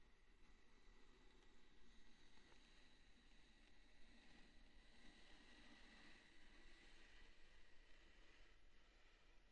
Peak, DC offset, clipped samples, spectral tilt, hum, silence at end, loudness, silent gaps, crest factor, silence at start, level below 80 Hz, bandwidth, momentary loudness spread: -52 dBFS; under 0.1%; under 0.1%; -3.5 dB/octave; none; 0 s; -68 LUFS; none; 14 dB; 0 s; -72 dBFS; 9 kHz; 3 LU